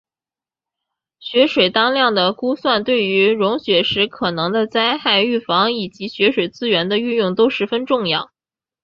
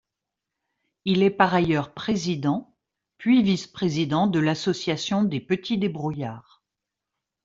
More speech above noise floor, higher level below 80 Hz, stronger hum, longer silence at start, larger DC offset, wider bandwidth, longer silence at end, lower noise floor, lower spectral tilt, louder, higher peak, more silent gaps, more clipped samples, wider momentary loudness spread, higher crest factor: first, over 73 dB vs 63 dB; about the same, -58 dBFS vs -60 dBFS; neither; first, 1.2 s vs 1.05 s; neither; about the same, 7 kHz vs 7.6 kHz; second, 0.6 s vs 1.05 s; first, under -90 dBFS vs -86 dBFS; about the same, -6 dB/octave vs -6 dB/octave; first, -17 LUFS vs -24 LUFS; about the same, -2 dBFS vs -2 dBFS; neither; neither; second, 6 LU vs 10 LU; second, 16 dB vs 22 dB